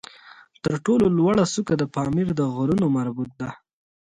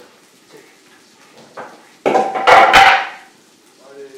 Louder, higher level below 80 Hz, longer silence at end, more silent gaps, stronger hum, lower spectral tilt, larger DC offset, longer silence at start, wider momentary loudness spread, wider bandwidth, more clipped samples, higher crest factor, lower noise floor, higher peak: second, -22 LUFS vs -10 LUFS; second, -52 dBFS vs -46 dBFS; first, 0.6 s vs 0.1 s; neither; neither; first, -6.5 dB/octave vs -2 dB/octave; neither; second, 0.25 s vs 1.55 s; about the same, 12 LU vs 14 LU; second, 11 kHz vs 18 kHz; second, under 0.1% vs 0.3%; about the same, 16 dB vs 16 dB; about the same, -49 dBFS vs -49 dBFS; second, -6 dBFS vs 0 dBFS